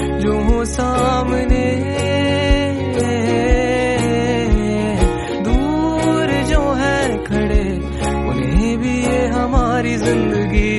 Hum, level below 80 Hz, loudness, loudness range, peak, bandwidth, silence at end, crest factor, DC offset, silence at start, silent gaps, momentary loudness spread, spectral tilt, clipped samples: none; -22 dBFS; -17 LUFS; 1 LU; -2 dBFS; 11.5 kHz; 0 s; 14 dB; under 0.1%; 0 s; none; 3 LU; -6 dB/octave; under 0.1%